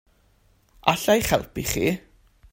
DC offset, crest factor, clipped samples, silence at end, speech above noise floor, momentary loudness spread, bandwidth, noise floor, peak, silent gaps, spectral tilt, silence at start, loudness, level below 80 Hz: under 0.1%; 24 dB; under 0.1%; 0.55 s; 38 dB; 7 LU; 16.5 kHz; -61 dBFS; 0 dBFS; none; -4 dB/octave; 0.85 s; -23 LUFS; -44 dBFS